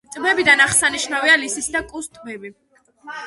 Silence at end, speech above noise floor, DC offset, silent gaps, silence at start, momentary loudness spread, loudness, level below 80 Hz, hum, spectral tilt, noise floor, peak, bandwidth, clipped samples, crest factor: 0 s; 20 dB; under 0.1%; none; 0.1 s; 22 LU; -15 LUFS; -52 dBFS; none; -1 dB/octave; -39 dBFS; 0 dBFS; 12 kHz; under 0.1%; 20 dB